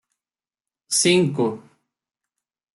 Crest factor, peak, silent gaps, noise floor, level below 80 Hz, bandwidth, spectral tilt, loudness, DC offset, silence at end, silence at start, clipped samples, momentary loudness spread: 20 dB; -6 dBFS; none; under -90 dBFS; -66 dBFS; 12 kHz; -3.5 dB/octave; -19 LUFS; under 0.1%; 1.15 s; 0.9 s; under 0.1%; 10 LU